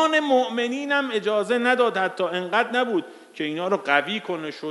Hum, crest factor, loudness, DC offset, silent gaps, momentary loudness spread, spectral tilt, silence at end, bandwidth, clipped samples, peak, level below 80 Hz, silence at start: none; 20 dB; -23 LUFS; under 0.1%; none; 9 LU; -4 dB/octave; 0 s; 11.5 kHz; under 0.1%; -4 dBFS; -82 dBFS; 0 s